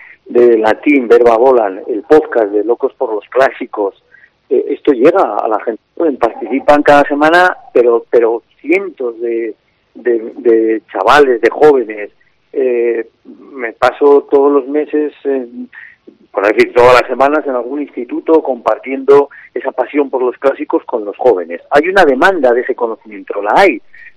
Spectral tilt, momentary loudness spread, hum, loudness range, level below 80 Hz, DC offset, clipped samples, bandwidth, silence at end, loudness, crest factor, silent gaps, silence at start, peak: -5.5 dB/octave; 12 LU; none; 3 LU; -48 dBFS; under 0.1%; 0.7%; 11.5 kHz; 0.1 s; -12 LUFS; 12 dB; none; 0.25 s; 0 dBFS